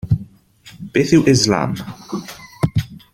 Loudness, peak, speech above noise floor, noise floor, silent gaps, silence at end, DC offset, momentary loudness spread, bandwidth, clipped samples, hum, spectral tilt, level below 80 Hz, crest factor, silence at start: -17 LUFS; -2 dBFS; 29 dB; -45 dBFS; none; 0.15 s; under 0.1%; 16 LU; 16.5 kHz; under 0.1%; none; -5.5 dB/octave; -40 dBFS; 18 dB; 0.05 s